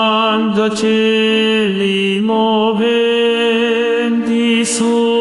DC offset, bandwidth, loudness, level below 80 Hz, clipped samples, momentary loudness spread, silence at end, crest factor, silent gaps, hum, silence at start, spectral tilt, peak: under 0.1%; 11.5 kHz; -13 LUFS; -58 dBFS; under 0.1%; 2 LU; 0 s; 12 dB; none; none; 0 s; -4 dB/octave; -2 dBFS